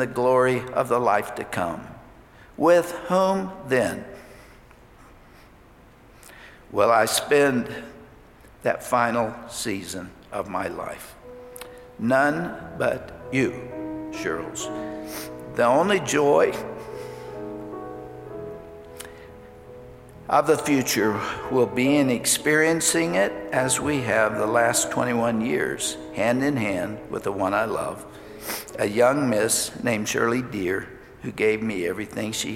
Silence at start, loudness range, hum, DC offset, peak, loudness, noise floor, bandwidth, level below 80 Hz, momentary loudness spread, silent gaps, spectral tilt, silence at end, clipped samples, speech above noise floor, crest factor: 0 s; 7 LU; none; under 0.1%; -6 dBFS; -23 LUFS; -51 dBFS; 16.5 kHz; -54 dBFS; 19 LU; none; -4 dB/octave; 0 s; under 0.1%; 28 dB; 18 dB